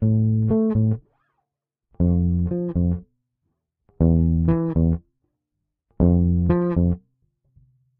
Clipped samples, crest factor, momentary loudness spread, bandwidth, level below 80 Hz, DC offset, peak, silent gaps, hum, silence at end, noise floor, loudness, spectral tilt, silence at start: under 0.1%; 16 dB; 6 LU; 2.7 kHz; -34 dBFS; under 0.1%; -4 dBFS; none; none; 1 s; -82 dBFS; -21 LUFS; -13 dB/octave; 0 s